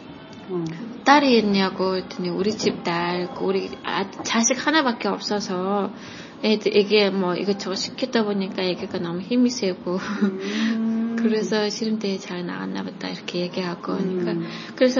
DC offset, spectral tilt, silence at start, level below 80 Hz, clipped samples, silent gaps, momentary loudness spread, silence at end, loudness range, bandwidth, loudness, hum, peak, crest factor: under 0.1%; -4.5 dB/octave; 0 s; -64 dBFS; under 0.1%; none; 11 LU; 0 s; 4 LU; 7.4 kHz; -23 LUFS; none; 0 dBFS; 22 dB